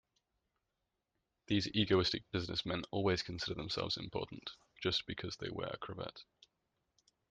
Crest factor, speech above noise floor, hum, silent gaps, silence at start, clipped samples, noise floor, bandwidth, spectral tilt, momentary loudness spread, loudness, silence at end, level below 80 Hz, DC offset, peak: 22 dB; 49 dB; none; none; 1.5 s; under 0.1%; -87 dBFS; 9.4 kHz; -5 dB/octave; 13 LU; -38 LUFS; 1.05 s; -64 dBFS; under 0.1%; -18 dBFS